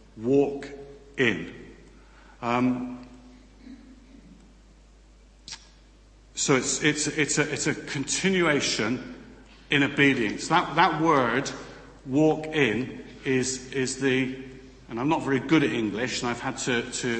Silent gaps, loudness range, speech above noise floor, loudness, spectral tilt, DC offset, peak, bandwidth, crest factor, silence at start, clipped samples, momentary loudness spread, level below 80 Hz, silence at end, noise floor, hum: none; 10 LU; 28 dB; -25 LUFS; -4 dB/octave; under 0.1%; -4 dBFS; 8.8 kHz; 22 dB; 0.15 s; under 0.1%; 19 LU; -54 dBFS; 0 s; -53 dBFS; none